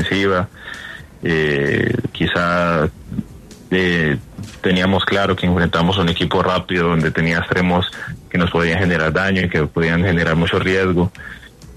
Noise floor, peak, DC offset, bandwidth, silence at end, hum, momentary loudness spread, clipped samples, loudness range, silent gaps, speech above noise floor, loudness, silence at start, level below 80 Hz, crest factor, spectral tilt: -38 dBFS; -2 dBFS; under 0.1%; 12.5 kHz; 0 s; none; 13 LU; under 0.1%; 2 LU; none; 21 dB; -17 LUFS; 0 s; -38 dBFS; 14 dB; -6.5 dB/octave